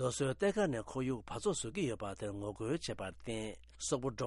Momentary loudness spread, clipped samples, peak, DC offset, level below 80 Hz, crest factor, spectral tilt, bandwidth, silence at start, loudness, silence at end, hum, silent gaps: 9 LU; under 0.1%; -20 dBFS; under 0.1%; -60 dBFS; 18 dB; -5 dB/octave; 11.5 kHz; 0 s; -38 LUFS; 0 s; none; none